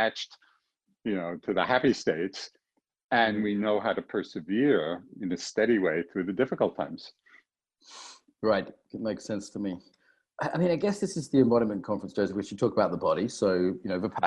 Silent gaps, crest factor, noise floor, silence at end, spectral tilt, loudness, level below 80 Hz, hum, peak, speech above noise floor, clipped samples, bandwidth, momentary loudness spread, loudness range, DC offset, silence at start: none; 20 dB; -79 dBFS; 0 s; -5.5 dB/octave; -28 LUFS; -66 dBFS; none; -8 dBFS; 51 dB; under 0.1%; 11 kHz; 13 LU; 6 LU; under 0.1%; 0 s